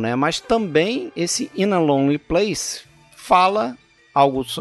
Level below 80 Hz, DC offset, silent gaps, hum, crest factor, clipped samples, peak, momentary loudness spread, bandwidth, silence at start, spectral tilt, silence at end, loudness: -48 dBFS; under 0.1%; none; none; 18 dB; under 0.1%; -2 dBFS; 8 LU; 12 kHz; 0 s; -4.5 dB/octave; 0 s; -19 LUFS